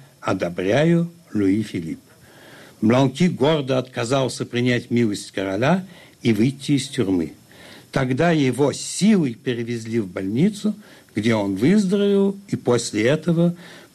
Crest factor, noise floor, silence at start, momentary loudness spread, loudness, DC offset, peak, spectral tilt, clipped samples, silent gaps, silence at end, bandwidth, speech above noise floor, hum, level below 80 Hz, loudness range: 14 dB; -46 dBFS; 0.25 s; 9 LU; -21 LUFS; under 0.1%; -8 dBFS; -6 dB/octave; under 0.1%; none; 0.15 s; 13.5 kHz; 26 dB; none; -56 dBFS; 2 LU